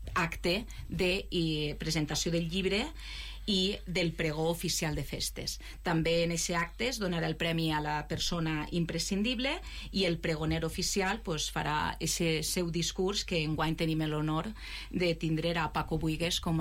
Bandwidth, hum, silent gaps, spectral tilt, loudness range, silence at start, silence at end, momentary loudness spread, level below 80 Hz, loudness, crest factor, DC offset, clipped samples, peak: 16 kHz; none; none; -4 dB/octave; 1 LU; 0 s; 0 s; 5 LU; -44 dBFS; -32 LUFS; 12 dB; under 0.1%; under 0.1%; -20 dBFS